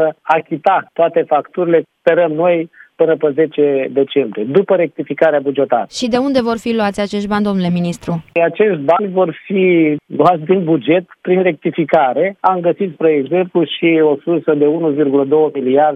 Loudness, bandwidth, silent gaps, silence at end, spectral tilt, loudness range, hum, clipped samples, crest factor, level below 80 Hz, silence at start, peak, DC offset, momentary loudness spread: -14 LUFS; 11.5 kHz; none; 0 s; -7 dB/octave; 2 LU; none; under 0.1%; 14 dB; -56 dBFS; 0 s; 0 dBFS; under 0.1%; 4 LU